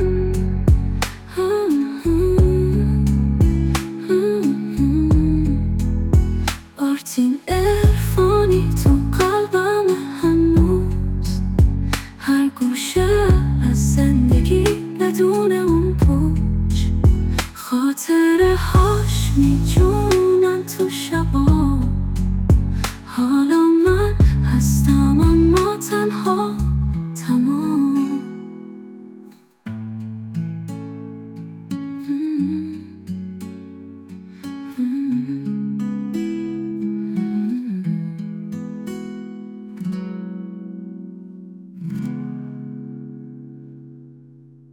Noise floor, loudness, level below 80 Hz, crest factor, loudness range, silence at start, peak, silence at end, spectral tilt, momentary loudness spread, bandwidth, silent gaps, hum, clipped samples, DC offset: -46 dBFS; -18 LUFS; -26 dBFS; 14 dB; 14 LU; 0 s; -4 dBFS; 0.65 s; -7 dB/octave; 18 LU; 18 kHz; none; none; under 0.1%; under 0.1%